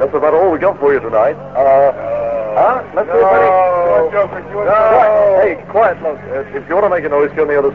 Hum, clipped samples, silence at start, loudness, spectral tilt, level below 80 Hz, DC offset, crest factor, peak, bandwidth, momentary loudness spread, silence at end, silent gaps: none; under 0.1%; 0 s; -13 LUFS; -8 dB/octave; -46 dBFS; 0.4%; 12 dB; 0 dBFS; 5.4 kHz; 9 LU; 0 s; none